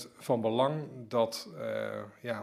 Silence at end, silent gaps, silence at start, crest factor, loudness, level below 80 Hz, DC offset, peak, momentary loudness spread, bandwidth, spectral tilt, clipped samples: 0 s; none; 0 s; 18 dB; -33 LUFS; -80 dBFS; under 0.1%; -14 dBFS; 10 LU; 15.5 kHz; -5.5 dB/octave; under 0.1%